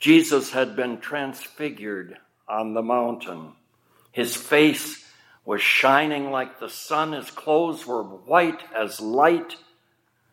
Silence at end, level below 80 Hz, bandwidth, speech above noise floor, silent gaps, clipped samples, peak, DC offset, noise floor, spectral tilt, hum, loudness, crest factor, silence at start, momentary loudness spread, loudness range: 0.75 s; -80 dBFS; 16.5 kHz; 44 dB; none; under 0.1%; -2 dBFS; under 0.1%; -67 dBFS; -4 dB/octave; none; -23 LUFS; 22 dB; 0 s; 17 LU; 7 LU